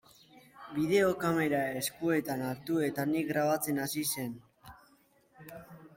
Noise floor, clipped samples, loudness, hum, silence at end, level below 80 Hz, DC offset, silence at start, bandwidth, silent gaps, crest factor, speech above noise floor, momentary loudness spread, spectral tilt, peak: -66 dBFS; under 0.1%; -31 LUFS; none; 0.1 s; -68 dBFS; under 0.1%; 0.35 s; 16.5 kHz; none; 18 dB; 35 dB; 21 LU; -4.5 dB/octave; -16 dBFS